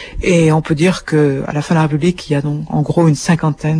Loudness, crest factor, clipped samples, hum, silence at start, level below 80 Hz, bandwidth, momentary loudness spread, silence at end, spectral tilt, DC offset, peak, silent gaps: -14 LUFS; 14 dB; under 0.1%; none; 0 s; -36 dBFS; 10.5 kHz; 6 LU; 0 s; -6.5 dB/octave; under 0.1%; 0 dBFS; none